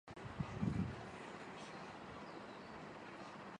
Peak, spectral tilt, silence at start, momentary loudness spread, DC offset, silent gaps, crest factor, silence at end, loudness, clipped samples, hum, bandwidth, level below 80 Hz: -28 dBFS; -6.5 dB/octave; 0.05 s; 11 LU; under 0.1%; none; 20 dB; 0 s; -48 LUFS; under 0.1%; none; 10 kHz; -62 dBFS